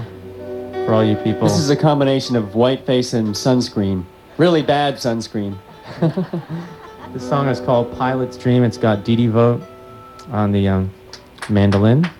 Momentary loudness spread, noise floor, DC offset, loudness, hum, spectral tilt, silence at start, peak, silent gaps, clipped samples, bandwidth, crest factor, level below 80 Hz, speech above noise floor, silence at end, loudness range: 18 LU; -38 dBFS; under 0.1%; -18 LUFS; none; -6.5 dB/octave; 0 s; -2 dBFS; none; under 0.1%; 13 kHz; 16 dB; -52 dBFS; 22 dB; 0.05 s; 4 LU